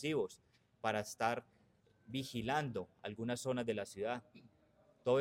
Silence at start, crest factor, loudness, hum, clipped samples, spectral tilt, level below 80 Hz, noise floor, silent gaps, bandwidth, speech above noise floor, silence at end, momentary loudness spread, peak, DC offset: 0 s; 20 dB; -40 LUFS; none; under 0.1%; -5 dB/octave; -74 dBFS; -71 dBFS; none; 16.5 kHz; 31 dB; 0 s; 7 LU; -20 dBFS; under 0.1%